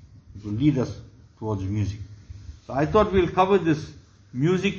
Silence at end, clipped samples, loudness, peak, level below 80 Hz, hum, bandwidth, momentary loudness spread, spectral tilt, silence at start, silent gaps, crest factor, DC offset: 0 s; under 0.1%; -24 LUFS; -6 dBFS; -44 dBFS; none; 7.4 kHz; 22 LU; -7.5 dB/octave; 0.3 s; none; 18 dB; under 0.1%